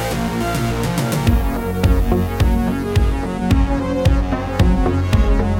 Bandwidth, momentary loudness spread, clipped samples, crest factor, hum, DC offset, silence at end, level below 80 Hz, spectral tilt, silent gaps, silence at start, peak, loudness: 16.5 kHz; 4 LU; under 0.1%; 14 dB; none; under 0.1%; 0 s; -20 dBFS; -6.5 dB/octave; none; 0 s; -2 dBFS; -18 LUFS